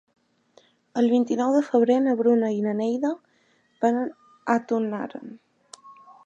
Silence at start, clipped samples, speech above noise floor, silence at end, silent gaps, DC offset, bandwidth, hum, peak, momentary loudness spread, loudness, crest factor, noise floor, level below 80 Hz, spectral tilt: 0.95 s; under 0.1%; 42 dB; 0.35 s; none; under 0.1%; 8.6 kHz; none; -6 dBFS; 14 LU; -23 LUFS; 18 dB; -64 dBFS; -78 dBFS; -6.5 dB/octave